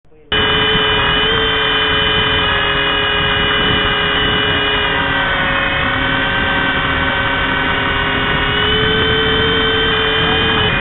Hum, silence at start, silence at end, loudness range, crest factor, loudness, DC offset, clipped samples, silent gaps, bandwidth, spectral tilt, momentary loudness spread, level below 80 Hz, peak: none; 0.3 s; 0 s; 2 LU; 12 dB; -13 LUFS; 0.2%; under 0.1%; none; 4.3 kHz; -1 dB/octave; 3 LU; -28 dBFS; -2 dBFS